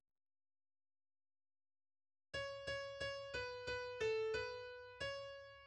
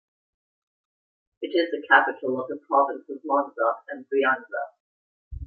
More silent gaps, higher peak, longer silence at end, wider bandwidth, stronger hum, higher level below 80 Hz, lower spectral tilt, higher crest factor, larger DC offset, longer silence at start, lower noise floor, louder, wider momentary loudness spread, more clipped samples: second, none vs 4.80-5.31 s; second, -30 dBFS vs -2 dBFS; about the same, 0 s vs 0 s; first, 10 kHz vs 4.8 kHz; neither; second, -70 dBFS vs -52 dBFS; second, -3 dB/octave vs -8 dB/octave; second, 18 dB vs 24 dB; neither; first, 2.35 s vs 1.4 s; about the same, under -90 dBFS vs under -90 dBFS; second, -45 LUFS vs -24 LUFS; second, 9 LU vs 15 LU; neither